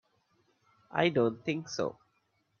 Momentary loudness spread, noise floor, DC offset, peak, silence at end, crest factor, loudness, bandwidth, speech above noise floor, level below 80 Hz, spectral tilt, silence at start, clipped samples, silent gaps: 9 LU; -75 dBFS; under 0.1%; -12 dBFS; 0.65 s; 22 dB; -32 LUFS; 7.2 kHz; 45 dB; -74 dBFS; -5.5 dB/octave; 0.9 s; under 0.1%; none